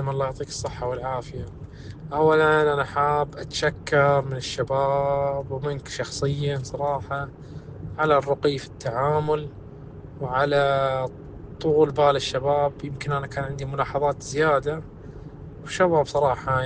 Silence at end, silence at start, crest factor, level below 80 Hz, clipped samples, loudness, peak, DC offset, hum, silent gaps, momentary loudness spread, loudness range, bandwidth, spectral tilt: 0 s; 0 s; 18 dB; -46 dBFS; under 0.1%; -24 LUFS; -6 dBFS; under 0.1%; none; none; 19 LU; 4 LU; 9.6 kHz; -5.5 dB/octave